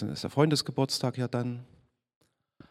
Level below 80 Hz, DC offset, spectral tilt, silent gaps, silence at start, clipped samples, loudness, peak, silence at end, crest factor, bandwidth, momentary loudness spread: -68 dBFS; under 0.1%; -5.5 dB/octave; none; 0 s; under 0.1%; -29 LUFS; -8 dBFS; 1.05 s; 22 dB; 15.5 kHz; 10 LU